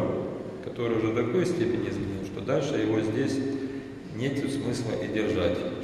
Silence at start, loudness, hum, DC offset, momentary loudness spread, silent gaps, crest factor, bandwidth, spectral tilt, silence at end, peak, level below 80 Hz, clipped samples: 0 s; -29 LUFS; none; under 0.1%; 8 LU; none; 16 dB; 12.5 kHz; -6.5 dB/octave; 0 s; -12 dBFS; -54 dBFS; under 0.1%